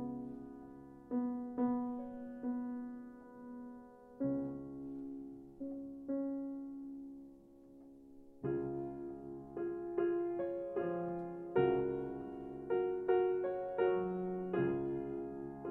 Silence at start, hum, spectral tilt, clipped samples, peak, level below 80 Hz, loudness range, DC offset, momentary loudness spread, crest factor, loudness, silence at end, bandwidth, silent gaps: 0 s; none; -10 dB/octave; under 0.1%; -20 dBFS; -68 dBFS; 9 LU; under 0.1%; 18 LU; 20 dB; -39 LUFS; 0 s; 4 kHz; none